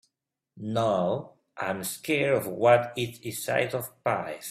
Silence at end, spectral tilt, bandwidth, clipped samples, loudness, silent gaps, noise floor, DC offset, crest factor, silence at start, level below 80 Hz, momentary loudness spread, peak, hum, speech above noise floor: 0 s; -4.5 dB/octave; 16 kHz; under 0.1%; -27 LUFS; none; -83 dBFS; under 0.1%; 22 dB; 0.55 s; -68 dBFS; 12 LU; -6 dBFS; none; 56 dB